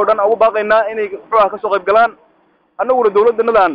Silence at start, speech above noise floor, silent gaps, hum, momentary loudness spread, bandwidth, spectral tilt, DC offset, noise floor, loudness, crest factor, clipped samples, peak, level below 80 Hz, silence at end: 0 s; 43 dB; none; none; 6 LU; 5.2 kHz; -7 dB/octave; under 0.1%; -55 dBFS; -14 LUFS; 12 dB; under 0.1%; -2 dBFS; -52 dBFS; 0 s